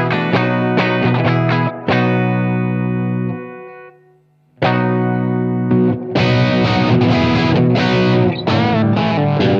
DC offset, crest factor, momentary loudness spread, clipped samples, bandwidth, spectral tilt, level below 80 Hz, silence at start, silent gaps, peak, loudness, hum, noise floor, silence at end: under 0.1%; 14 dB; 5 LU; under 0.1%; 7 kHz; -8 dB/octave; -44 dBFS; 0 s; none; 0 dBFS; -15 LUFS; none; -53 dBFS; 0 s